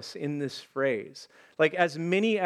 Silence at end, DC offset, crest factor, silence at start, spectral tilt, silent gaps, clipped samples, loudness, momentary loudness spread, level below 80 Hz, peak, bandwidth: 0 s; under 0.1%; 20 dB; 0 s; -5.5 dB/octave; none; under 0.1%; -28 LUFS; 20 LU; -84 dBFS; -8 dBFS; 13 kHz